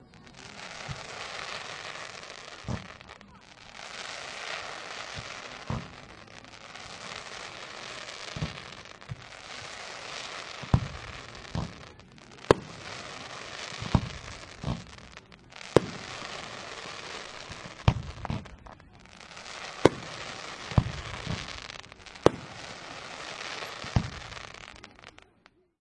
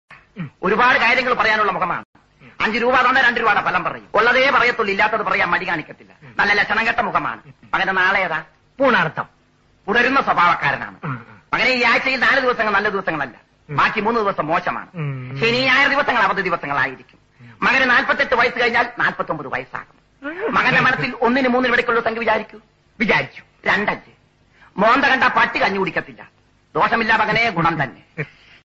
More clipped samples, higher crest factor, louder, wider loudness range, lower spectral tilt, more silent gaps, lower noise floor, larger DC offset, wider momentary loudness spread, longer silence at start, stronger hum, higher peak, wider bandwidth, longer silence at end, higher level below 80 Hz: neither; first, 34 dB vs 16 dB; second, -34 LUFS vs -17 LUFS; first, 7 LU vs 3 LU; first, -5 dB/octave vs -2 dB/octave; second, none vs 2.05-2.13 s; first, -63 dBFS vs -57 dBFS; neither; first, 20 LU vs 14 LU; about the same, 0 s vs 0.1 s; neither; first, 0 dBFS vs -4 dBFS; first, 12 kHz vs 8 kHz; first, 0.6 s vs 0.4 s; about the same, -48 dBFS vs -50 dBFS